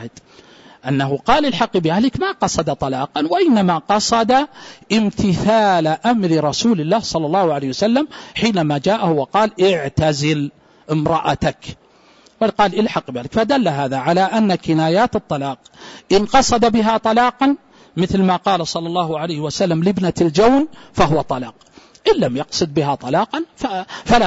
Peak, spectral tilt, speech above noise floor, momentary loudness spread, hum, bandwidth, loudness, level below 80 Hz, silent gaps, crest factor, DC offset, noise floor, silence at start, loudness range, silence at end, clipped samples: -2 dBFS; -5.5 dB/octave; 33 dB; 9 LU; none; 8 kHz; -17 LUFS; -42 dBFS; none; 14 dB; under 0.1%; -50 dBFS; 0 s; 3 LU; 0 s; under 0.1%